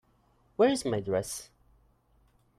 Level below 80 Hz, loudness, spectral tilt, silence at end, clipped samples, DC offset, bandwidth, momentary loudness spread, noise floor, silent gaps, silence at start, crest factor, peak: -62 dBFS; -29 LUFS; -4.5 dB/octave; 1.15 s; under 0.1%; under 0.1%; 15.5 kHz; 15 LU; -67 dBFS; none; 0.6 s; 20 dB; -14 dBFS